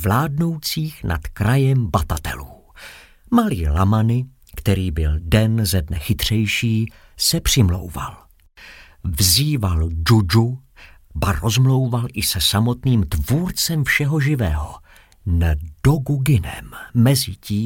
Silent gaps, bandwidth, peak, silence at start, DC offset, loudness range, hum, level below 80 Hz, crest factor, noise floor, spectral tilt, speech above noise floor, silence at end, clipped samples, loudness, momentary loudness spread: none; 17 kHz; -2 dBFS; 0 s; under 0.1%; 3 LU; none; -32 dBFS; 16 dB; -46 dBFS; -5 dB/octave; 27 dB; 0 s; under 0.1%; -19 LUFS; 12 LU